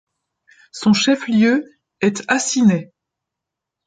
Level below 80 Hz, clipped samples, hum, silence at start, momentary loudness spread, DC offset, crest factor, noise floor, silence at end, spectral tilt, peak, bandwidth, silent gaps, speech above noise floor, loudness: -62 dBFS; under 0.1%; none; 0.75 s; 7 LU; under 0.1%; 16 dB; -83 dBFS; 1.05 s; -4.5 dB/octave; -2 dBFS; 9.4 kHz; none; 67 dB; -17 LUFS